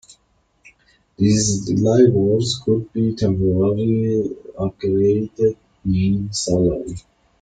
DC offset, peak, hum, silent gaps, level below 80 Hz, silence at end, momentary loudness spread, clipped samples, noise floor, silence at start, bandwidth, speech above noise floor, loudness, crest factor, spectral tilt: under 0.1%; -2 dBFS; none; none; -44 dBFS; 0.4 s; 12 LU; under 0.1%; -63 dBFS; 1.2 s; 9.4 kHz; 45 dB; -19 LUFS; 16 dB; -6.5 dB/octave